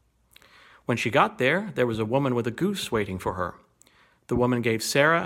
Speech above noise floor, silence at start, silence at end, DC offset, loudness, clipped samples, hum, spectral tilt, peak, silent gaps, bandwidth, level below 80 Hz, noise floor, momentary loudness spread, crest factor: 35 dB; 0.9 s; 0 s; under 0.1%; -25 LUFS; under 0.1%; none; -5 dB/octave; -6 dBFS; none; 16.5 kHz; -52 dBFS; -60 dBFS; 9 LU; 20 dB